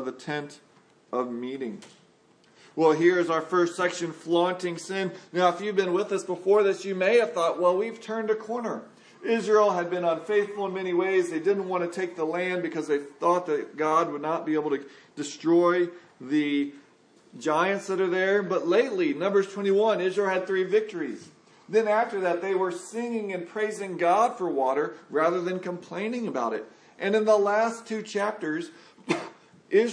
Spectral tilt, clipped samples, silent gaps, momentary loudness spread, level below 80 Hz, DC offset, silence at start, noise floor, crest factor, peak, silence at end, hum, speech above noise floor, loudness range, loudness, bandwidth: -5 dB/octave; under 0.1%; none; 11 LU; -86 dBFS; under 0.1%; 0 s; -60 dBFS; 20 dB; -6 dBFS; 0 s; none; 34 dB; 3 LU; -26 LUFS; 10.5 kHz